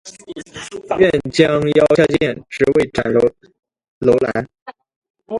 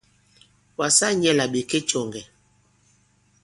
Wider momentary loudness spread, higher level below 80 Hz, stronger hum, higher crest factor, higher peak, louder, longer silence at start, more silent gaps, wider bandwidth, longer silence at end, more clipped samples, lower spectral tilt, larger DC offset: about the same, 18 LU vs 17 LU; first, -46 dBFS vs -64 dBFS; neither; about the same, 18 dB vs 22 dB; first, 0 dBFS vs -4 dBFS; first, -16 LUFS vs -21 LUFS; second, 0.05 s vs 0.8 s; first, 3.88-4.01 s, 4.62-4.66 s, 4.96-5.02 s, 5.10-5.14 s vs none; about the same, 11.5 kHz vs 11.5 kHz; second, 0 s vs 1.2 s; neither; first, -6 dB/octave vs -2.5 dB/octave; neither